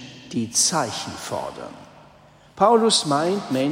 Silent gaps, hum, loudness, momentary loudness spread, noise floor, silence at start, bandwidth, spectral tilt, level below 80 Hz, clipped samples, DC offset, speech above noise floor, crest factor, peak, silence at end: none; none; -21 LUFS; 15 LU; -51 dBFS; 0 s; 16 kHz; -3 dB/octave; -60 dBFS; under 0.1%; under 0.1%; 30 dB; 18 dB; -4 dBFS; 0 s